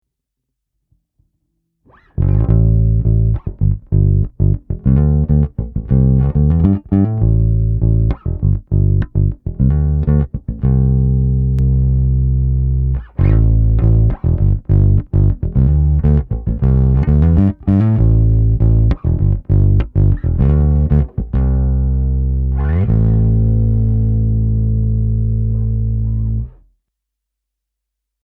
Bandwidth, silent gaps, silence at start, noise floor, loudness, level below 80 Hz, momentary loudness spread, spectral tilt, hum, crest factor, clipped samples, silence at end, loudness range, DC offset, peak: 2.6 kHz; none; 2.2 s; -78 dBFS; -15 LUFS; -18 dBFS; 5 LU; -13 dB/octave; none; 14 dB; under 0.1%; 1.75 s; 3 LU; under 0.1%; 0 dBFS